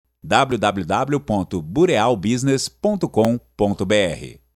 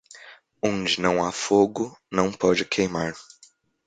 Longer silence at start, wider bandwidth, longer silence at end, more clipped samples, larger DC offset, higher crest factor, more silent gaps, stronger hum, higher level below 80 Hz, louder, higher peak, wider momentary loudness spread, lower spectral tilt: about the same, 0.25 s vs 0.15 s; first, 19 kHz vs 9.4 kHz; second, 0.2 s vs 0.65 s; neither; neither; about the same, 18 dB vs 22 dB; neither; neither; first, -48 dBFS vs -56 dBFS; first, -20 LUFS vs -24 LUFS; first, 0 dBFS vs -4 dBFS; second, 6 LU vs 9 LU; about the same, -5.5 dB/octave vs -4.5 dB/octave